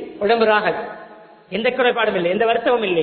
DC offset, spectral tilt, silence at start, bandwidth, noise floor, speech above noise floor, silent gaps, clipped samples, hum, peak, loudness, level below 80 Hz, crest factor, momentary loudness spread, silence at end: under 0.1%; -9.5 dB/octave; 0 s; 4.5 kHz; -42 dBFS; 24 dB; none; under 0.1%; none; -2 dBFS; -18 LUFS; -58 dBFS; 16 dB; 13 LU; 0 s